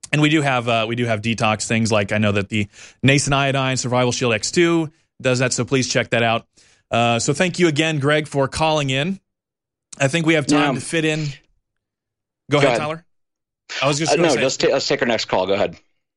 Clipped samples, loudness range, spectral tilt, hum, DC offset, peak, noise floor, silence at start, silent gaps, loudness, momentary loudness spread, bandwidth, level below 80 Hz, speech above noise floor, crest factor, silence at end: under 0.1%; 3 LU; -4.5 dB/octave; none; under 0.1%; -2 dBFS; -86 dBFS; 0.1 s; none; -19 LUFS; 7 LU; 11.5 kHz; -50 dBFS; 67 dB; 18 dB; 0.4 s